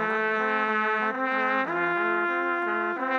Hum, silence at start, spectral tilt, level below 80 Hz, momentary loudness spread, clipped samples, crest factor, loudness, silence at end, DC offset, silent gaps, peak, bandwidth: none; 0 s; -6 dB/octave; under -90 dBFS; 2 LU; under 0.1%; 14 dB; -25 LUFS; 0 s; under 0.1%; none; -12 dBFS; 7.4 kHz